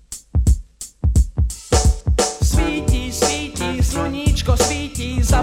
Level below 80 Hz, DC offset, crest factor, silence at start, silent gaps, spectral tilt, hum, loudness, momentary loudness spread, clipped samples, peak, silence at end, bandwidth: -20 dBFS; under 0.1%; 16 dB; 0.1 s; none; -4.5 dB/octave; none; -19 LUFS; 6 LU; under 0.1%; 0 dBFS; 0 s; 16 kHz